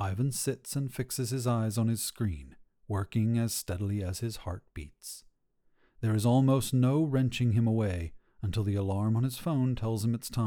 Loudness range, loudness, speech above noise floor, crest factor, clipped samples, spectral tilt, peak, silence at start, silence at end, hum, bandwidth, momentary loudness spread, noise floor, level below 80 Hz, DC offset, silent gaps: 6 LU; -30 LUFS; 40 dB; 16 dB; under 0.1%; -6 dB/octave; -14 dBFS; 0 s; 0 s; none; 19 kHz; 14 LU; -70 dBFS; -52 dBFS; under 0.1%; none